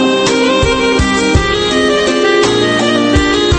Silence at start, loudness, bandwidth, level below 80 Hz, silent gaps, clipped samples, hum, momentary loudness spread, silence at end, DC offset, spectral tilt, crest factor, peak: 0 s; -11 LUFS; 8.8 kHz; -24 dBFS; none; under 0.1%; none; 1 LU; 0 s; under 0.1%; -4.5 dB/octave; 10 dB; 0 dBFS